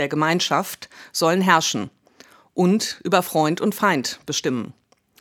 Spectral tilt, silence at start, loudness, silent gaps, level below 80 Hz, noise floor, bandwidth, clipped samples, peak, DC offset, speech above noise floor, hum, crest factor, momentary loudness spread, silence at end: -4 dB/octave; 0 s; -21 LUFS; none; -70 dBFS; -51 dBFS; 18.5 kHz; under 0.1%; 0 dBFS; under 0.1%; 30 dB; none; 22 dB; 14 LU; 0.5 s